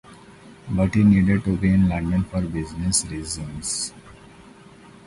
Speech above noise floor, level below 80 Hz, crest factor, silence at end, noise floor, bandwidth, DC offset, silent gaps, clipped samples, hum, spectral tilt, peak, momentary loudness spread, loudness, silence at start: 26 dB; -38 dBFS; 16 dB; 0.9 s; -47 dBFS; 11.5 kHz; under 0.1%; none; under 0.1%; none; -5.5 dB/octave; -6 dBFS; 13 LU; -22 LUFS; 0.1 s